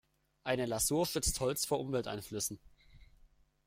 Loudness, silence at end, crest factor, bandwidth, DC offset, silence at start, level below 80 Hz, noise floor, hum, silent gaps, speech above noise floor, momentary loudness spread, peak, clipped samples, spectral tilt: -35 LUFS; 0.65 s; 18 dB; 16 kHz; under 0.1%; 0.45 s; -52 dBFS; -65 dBFS; none; none; 31 dB; 9 LU; -18 dBFS; under 0.1%; -3.5 dB/octave